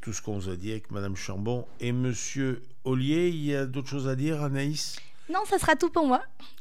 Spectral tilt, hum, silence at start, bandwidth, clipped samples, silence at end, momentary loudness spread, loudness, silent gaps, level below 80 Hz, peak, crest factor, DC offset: -5.5 dB/octave; none; 0 s; 15.5 kHz; under 0.1%; 0.1 s; 11 LU; -29 LUFS; none; -56 dBFS; -8 dBFS; 20 dB; 2%